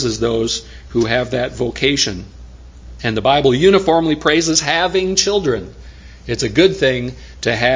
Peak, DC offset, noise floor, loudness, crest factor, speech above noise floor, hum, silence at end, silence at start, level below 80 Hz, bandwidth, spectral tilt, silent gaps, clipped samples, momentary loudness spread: 0 dBFS; under 0.1%; -37 dBFS; -16 LUFS; 16 dB; 21 dB; none; 0 s; 0 s; -38 dBFS; 7.6 kHz; -4 dB/octave; none; under 0.1%; 11 LU